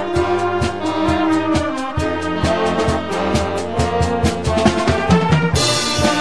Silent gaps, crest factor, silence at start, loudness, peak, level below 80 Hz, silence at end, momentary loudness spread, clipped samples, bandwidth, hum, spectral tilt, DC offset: none; 16 dB; 0 s; -17 LUFS; 0 dBFS; -32 dBFS; 0 s; 5 LU; under 0.1%; 11 kHz; none; -5 dB/octave; 2%